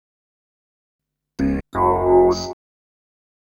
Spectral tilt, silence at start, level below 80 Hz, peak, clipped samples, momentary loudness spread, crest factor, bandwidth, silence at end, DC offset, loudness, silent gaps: -6.5 dB/octave; 1.4 s; -40 dBFS; -4 dBFS; under 0.1%; 14 LU; 18 dB; 7.2 kHz; 0.9 s; under 0.1%; -18 LUFS; none